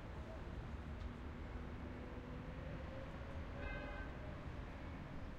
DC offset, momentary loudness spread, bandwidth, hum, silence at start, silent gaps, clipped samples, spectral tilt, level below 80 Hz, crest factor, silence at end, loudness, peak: under 0.1%; 3 LU; 9.6 kHz; none; 0 s; none; under 0.1%; -7.5 dB/octave; -52 dBFS; 14 dB; 0 s; -50 LUFS; -36 dBFS